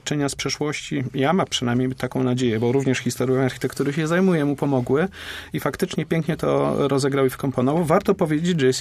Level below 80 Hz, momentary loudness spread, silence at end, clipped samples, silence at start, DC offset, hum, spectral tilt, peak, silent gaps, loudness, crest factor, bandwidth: -52 dBFS; 6 LU; 0 s; under 0.1%; 0.05 s; under 0.1%; none; -5.5 dB/octave; -4 dBFS; none; -22 LUFS; 16 dB; 15.5 kHz